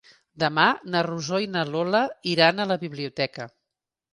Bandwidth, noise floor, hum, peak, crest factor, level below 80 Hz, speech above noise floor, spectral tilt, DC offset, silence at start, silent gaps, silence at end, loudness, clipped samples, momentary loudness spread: 11.5 kHz; -85 dBFS; none; -4 dBFS; 22 dB; -68 dBFS; 61 dB; -5 dB/octave; under 0.1%; 0.35 s; none; 0.65 s; -24 LUFS; under 0.1%; 9 LU